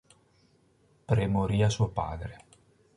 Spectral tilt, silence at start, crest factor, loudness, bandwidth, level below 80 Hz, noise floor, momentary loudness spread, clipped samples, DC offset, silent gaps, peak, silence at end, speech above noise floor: -6.5 dB/octave; 1.1 s; 18 dB; -29 LUFS; 11 kHz; -46 dBFS; -65 dBFS; 13 LU; under 0.1%; under 0.1%; none; -12 dBFS; 0.6 s; 38 dB